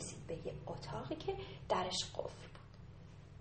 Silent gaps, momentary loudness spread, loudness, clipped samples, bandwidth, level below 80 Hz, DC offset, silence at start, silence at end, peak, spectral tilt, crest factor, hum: none; 19 LU; -42 LUFS; under 0.1%; 8.4 kHz; -60 dBFS; under 0.1%; 0 s; 0 s; -22 dBFS; -4 dB/octave; 22 dB; none